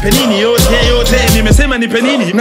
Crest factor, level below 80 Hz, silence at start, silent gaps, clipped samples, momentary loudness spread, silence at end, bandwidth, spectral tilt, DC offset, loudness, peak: 10 dB; -16 dBFS; 0 s; none; under 0.1%; 3 LU; 0 s; 16.5 kHz; -4.5 dB/octave; under 0.1%; -10 LUFS; 0 dBFS